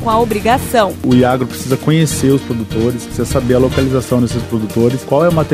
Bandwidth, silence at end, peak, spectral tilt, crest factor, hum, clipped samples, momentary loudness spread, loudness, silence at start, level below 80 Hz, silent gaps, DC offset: 15.5 kHz; 0 s; 0 dBFS; -6 dB/octave; 14 dB; none; under 0.1%; 6 LU; -14 LUFS; 0 s; -34 dBFS; none; under 0.1%